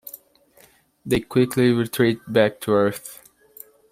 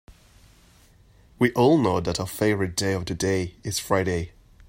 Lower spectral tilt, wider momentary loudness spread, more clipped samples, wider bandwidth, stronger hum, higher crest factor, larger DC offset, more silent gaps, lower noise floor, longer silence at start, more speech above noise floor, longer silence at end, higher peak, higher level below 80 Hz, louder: about the same, -6 dB/octave vs -5 dB/octave; first, 21 LU vs 10 LU; neither; about the same, 16 kHz vs 16 kHz; neither; about the same, 20 dB vs 20 dB; neither; neither; about the same, -55 dBFS vs -55 dBFS; about the same, 0.05 s vs 0.1 s; about the same, 35 dB vs 32 dB; first, 0.75 s vs 0.4 s; about the same, -4 dBFS vs -6 dBFS; about the same, -52 dBFS vs -50 dBFS; first, -21 LUFS vs -24 LUFS